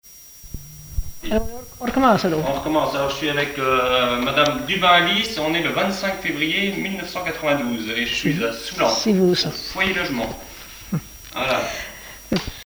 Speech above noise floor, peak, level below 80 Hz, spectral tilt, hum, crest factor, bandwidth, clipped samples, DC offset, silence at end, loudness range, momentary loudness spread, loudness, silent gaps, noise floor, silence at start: 22 dB; -4 dBFS; -40 dBFS; -4 dB/octave; none; 18 dB; over 20 kHz; under 0.1%; under 0.1%; 0 s; 4 LU; 16 LU; -20 LUFS; none; -42 dBFS; 0.05 s